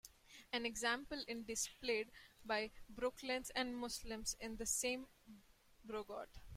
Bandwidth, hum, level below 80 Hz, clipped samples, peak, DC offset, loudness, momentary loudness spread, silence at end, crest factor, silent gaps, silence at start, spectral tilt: 16.5 kHz; none; -64 dBFS; under 0.1%; -26 dBFS; under 0.1%; -43 LUFS; 13 LU; 0 s; 20 dB; none; 0.05 s; -1.5 dB/octave